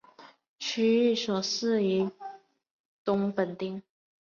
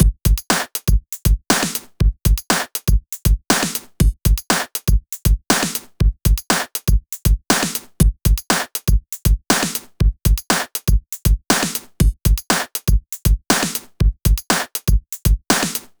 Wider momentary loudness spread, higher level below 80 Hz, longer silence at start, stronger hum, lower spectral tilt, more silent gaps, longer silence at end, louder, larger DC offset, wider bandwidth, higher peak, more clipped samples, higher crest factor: first, 13 LU vs 4 LU; second, -74 dBFS vs -20 dBFS; first, 0.2 s vs 0 s; neither; about the same, -5 dB/octave vs -4 dB/octave; first, 0.49-0.56 s, 2.71-3.05 s vs none; first, 0.45 s vs 0.2 s; second, -28 LUFS vs -19 LUFS; neither; second, 7.4 kHz vs over 20 kHz; second, -14 dBFS vs 0 dBFS; neither; about the same, 16 dB vs 18 dB